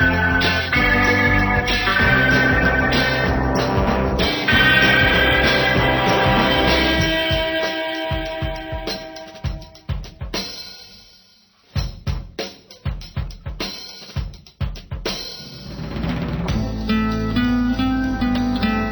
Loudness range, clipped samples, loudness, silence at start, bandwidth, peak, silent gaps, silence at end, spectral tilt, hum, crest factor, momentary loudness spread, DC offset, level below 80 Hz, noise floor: 15 LU; under 0.1%; -18 LUFS; 0 s; over 20 kHz; -4 dBFS; none; 0 s; -5.5 dB/octave; none; 16 dB; 16 LU; under 0.1%; -30 dBFS; -54 dBFS